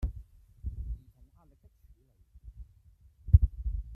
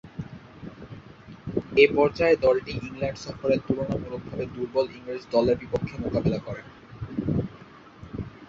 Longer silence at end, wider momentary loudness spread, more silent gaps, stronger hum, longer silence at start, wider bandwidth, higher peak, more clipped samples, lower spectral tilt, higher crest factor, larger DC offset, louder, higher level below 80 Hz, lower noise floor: about the same, 0 s vs 0.05 s; first, 27 LU vs 23 LU; neither; neither; about the same, 0 s vs 0.05 s; second, 1.3 kHz vs 7.4 kHz; about the same, -6 dBFS vs -4 dBFS; neither; first, -11 dB/octave vs -7 dB/octave; about the same, 26 dB vs 24 dB; neither; second, -30 LUFS vs -26 LUFS; first, -36 dBFS vs -48 dBFS; first, -61 dBFS vs -48 dBFS